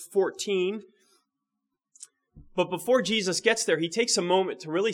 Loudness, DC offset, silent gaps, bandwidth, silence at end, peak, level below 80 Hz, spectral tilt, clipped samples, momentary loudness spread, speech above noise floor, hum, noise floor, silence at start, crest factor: -26 LUFS; under 0.1%; none; 17.5 kHz; 0 s; -8 dBFS; -66 dBFS; -3 dB/octave; under 0.1%; 7 LU; 58 dB; none; -84 dBFS; 0 s; 20 dB